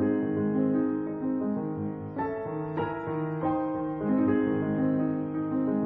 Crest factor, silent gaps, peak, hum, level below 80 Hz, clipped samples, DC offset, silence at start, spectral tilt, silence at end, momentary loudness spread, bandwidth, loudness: 14 dB; none; -14 dBFS; none; -60 dBFS; under 0.1%; under 0.1%; 0 s; -12 dB/octave; 0 s; 7 LU; 3.8 kHz; -29 LUFS